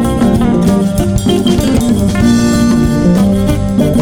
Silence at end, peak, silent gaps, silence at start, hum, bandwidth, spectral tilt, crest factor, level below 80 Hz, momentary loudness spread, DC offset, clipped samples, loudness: 0 s; 0 dBFS; none; 0 s; none; 19 kHz; -6.5 dB/octave; 10 dB; -22 dBFS; 3 LU; under 0.1%; under 0.1%; -11 LUFS